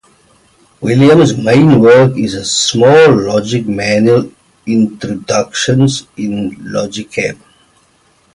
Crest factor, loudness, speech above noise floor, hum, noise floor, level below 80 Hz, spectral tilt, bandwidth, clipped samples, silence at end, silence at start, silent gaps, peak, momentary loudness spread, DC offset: 12 dB; -11 LUFS; 42 dB; none; -52 dBFS; -46 dBFS; -5.5 dB/octave; 11.5 kHz; under 0.1%; 1 s; 0.8 s; none; 0 dBFS; 13 LU; under 0.1%